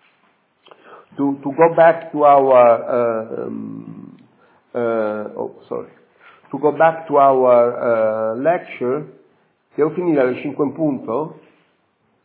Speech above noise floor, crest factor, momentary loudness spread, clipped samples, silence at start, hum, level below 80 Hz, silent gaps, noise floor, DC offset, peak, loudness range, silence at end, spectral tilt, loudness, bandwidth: 47 dB; 18 dB; 18 LU; under 0.1%; 0.9 s; none; -76 dBFS; none; -63 dBFS; under 0.1%; 0 dBFS; 9 LU; 0.9 s; -10.5 dB/octave; -17 LUFS; 4 kHz